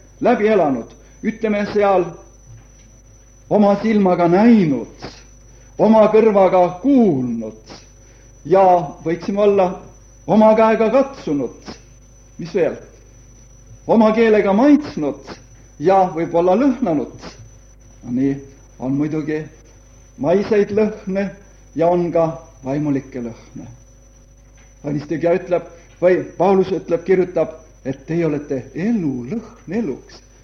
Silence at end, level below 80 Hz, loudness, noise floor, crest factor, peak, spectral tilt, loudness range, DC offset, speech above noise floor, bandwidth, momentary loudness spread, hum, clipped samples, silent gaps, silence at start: 0.25 s; -46 dBFS; -17 LUFS; -46 dBFS; 16 dB; -2 dBFS; -7.5 dB/octave; 7 LU; under 0.1%; 30 dB; 7 kHz; 19 LU; none; under 0.1%; none; 0.2 s